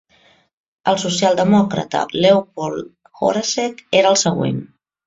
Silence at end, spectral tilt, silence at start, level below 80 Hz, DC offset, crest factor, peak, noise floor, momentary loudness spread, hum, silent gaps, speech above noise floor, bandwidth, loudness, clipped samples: 0.4 s; -4.5 dB/octave; 0.85 s; -56 dBFS; under 0.1%; 18 dB; 0 dBFS; -55 dBFS; 11 LU; none; none; 38 dB; 7.8 kHz; -17 LUFS; under 0.1%